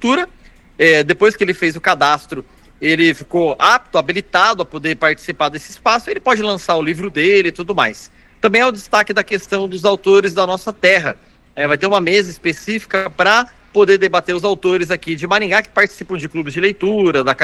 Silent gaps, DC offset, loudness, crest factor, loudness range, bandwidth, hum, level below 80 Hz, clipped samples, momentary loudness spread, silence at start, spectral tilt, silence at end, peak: none; under 0.1%; -15 LUFS; 16 dB; 2 LU; 12.5 kHz; none; -50 dBFS; under 0.1%; 8 LU; 0 s; -4.5 dB/octave; 0 s; 0 dBFS